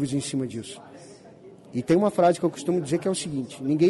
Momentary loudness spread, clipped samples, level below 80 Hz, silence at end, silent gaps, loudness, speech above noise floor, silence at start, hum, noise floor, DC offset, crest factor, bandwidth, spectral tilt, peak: 19 LU; under 0.1%; -62 dBFS; 0 s; none; -25 LUFS; 23 dB; 0 s; none; -48 dBFS; under 0.1%; 16 dB; 11.5 kHz; -6 dB/octave; -10 dBFS